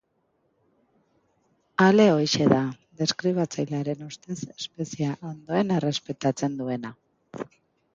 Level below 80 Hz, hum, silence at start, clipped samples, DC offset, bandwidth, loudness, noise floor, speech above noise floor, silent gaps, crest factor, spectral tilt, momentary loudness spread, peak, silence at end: -64 dBFS; none; 1.8 s; under 0.1%; under 0.1%; 7.6 kHz; -25 LUFS; -71 dBFS; 47 dB; none; 22 dB; -5.5 dB/octave; 17 LU; -4 dBFS; 0.5 s